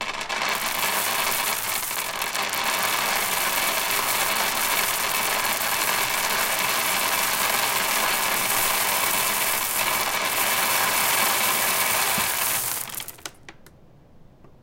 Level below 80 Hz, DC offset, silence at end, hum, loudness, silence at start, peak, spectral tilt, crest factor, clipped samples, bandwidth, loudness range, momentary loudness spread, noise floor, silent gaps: -54 dBFS; under 0.1%; 0.15 s; none; -21 LUFS; 0 s; -4 dBFS; 0 dB/octave; 20 dB; under 0.1%; 17.5 kHz; 2 LU; 5 LU; -50 dBFS; none